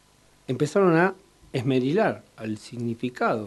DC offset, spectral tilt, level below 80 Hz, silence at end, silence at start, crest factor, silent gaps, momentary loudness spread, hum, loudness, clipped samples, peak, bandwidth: under 0.1%; -7 dB/octave; -64 dBFS; 0 s; 0.5 s; 20 dB; none; 14 LU; none; -25 LUFS; under 0.1%; -6 dBFS; 12 kHz